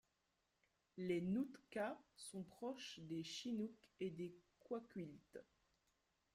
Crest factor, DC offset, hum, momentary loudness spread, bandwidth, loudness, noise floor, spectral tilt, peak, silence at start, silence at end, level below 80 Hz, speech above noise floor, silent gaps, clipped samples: 18 dB; under 0.1%; none; 13 LU; 14.5 kHz; -49 LUFS; -86 dBFS; -5.5 dB/octave; -32 dBFS; 0.95 s; 0.95 s; -84 dBFS; 38 dB; none; under 0.1%